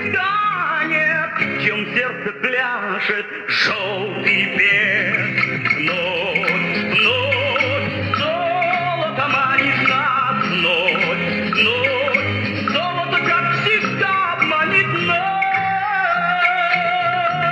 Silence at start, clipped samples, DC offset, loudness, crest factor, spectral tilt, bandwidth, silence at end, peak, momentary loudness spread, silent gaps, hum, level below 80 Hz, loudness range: 0 s; under 0.1%; under 0.1%; -17 LUFS; 16 dB; -5 dB/octave; 10 kHz; 0 s; -2 dBFS; 5 LU; none; none; -62 dBFS; 2 LU